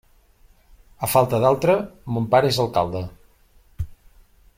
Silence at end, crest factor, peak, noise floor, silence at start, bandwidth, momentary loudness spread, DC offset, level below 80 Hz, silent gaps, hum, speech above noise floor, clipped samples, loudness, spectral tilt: 0.65 s; 20 dB; -2 dBFS; -55 dBFS; 1 s; 16.5 kHz; 17 LU; under 0.1%; -46 dBFS; none; none; 35 dB; under 0.1%; -20 LUFS; -5.5 dB/octave